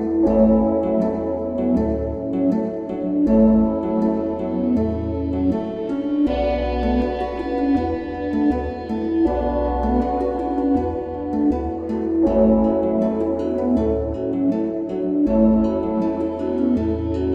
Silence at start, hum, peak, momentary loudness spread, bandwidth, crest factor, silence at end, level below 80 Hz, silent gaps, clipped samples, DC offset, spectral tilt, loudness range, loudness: 0 s; none; -4 dBFS; 8 LU; 5.4 kHz; 14 dB; 0 s; -34 dBFS; none; under 0.1%; under 0.1%; -10 dB/octave; 2 LU; -20 LUFS